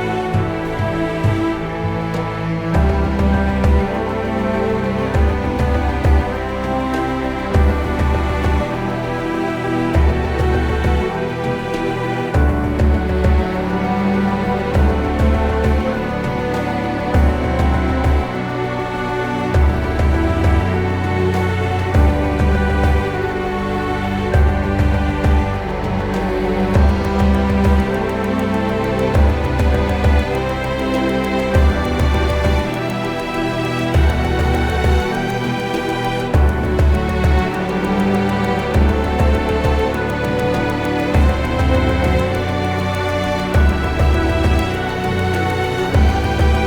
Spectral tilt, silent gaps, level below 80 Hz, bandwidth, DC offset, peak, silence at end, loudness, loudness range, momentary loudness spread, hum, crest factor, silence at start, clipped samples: -7 dB/octave; none; -22 dBFS; 13 kHz; under 0.1%; -2 dBFS; 0 s; -18 LUFS; 2 LU; 5 LU; none; 14 dB; 0 s; under 0.1%